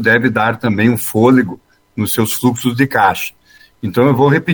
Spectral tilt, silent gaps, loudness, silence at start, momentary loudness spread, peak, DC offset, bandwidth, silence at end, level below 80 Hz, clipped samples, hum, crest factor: -5.5 dB/octave; none; -14 LUFS; 0 s; 11 LU; 0 dBFS; under 0.1%; over 20 kHz; 0 s; -50 dBFS; under 0.1%; none; 14 dB